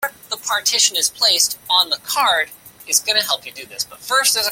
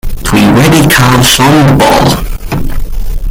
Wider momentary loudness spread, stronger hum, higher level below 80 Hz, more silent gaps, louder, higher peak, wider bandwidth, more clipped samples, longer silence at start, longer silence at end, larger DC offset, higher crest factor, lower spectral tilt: second, 12 LU vs 15 LU; neither; second, -62 dBFS vs -16 dBFS; neither; second, -16 LUFS vs -6 LUFS; about the same, 0 dBFS vs 0 dBFS; second, 17 kHz vs over 20 kHz; second, under 0.1% vs 0.7%; about the same, 0 s vs 0.05 s; about the same, 0 s vs 0 s; neither; first, 18 dB vs 6 dB; second, 2.5 dB/octave vs -4.5 dB/octave